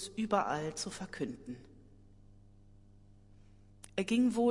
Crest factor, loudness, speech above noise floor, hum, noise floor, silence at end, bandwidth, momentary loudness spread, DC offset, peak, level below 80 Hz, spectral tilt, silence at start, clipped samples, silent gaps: 20 dB; -35 LUFS; 26 dB; none; -59 dBFS; 0 s; 11.5 kHz; 18 LU; under 0.1%; -18 dBFS; -62 dBFS; -5 dB/octave; 0 s; under 0.1%; none